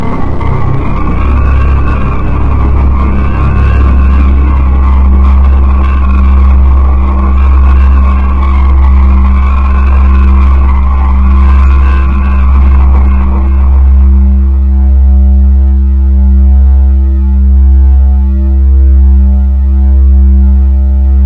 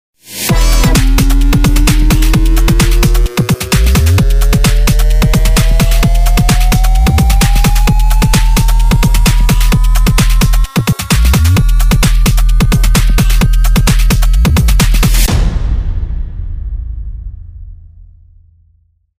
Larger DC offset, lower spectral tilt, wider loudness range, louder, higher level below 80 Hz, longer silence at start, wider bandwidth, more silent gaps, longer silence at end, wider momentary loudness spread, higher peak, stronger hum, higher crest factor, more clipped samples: neither; first, -10 dB/octave vs -5 dB/octave; about the same, 2 LU vs 4 LU; first, -8 LUFS vs -11 LUFS; about the same, -6 dBFS vs -10 dBFS; second, 0 s vs 0.3 s; second, 3.4 kHz vs 16.5 kHz; neither; second, 0 s vs 1.45 s; second, 4 LU vs 8 LU; about the same, 0 dBFS vs 0 dBFS; neither; about the same, 4 dB vs 8 dB; neither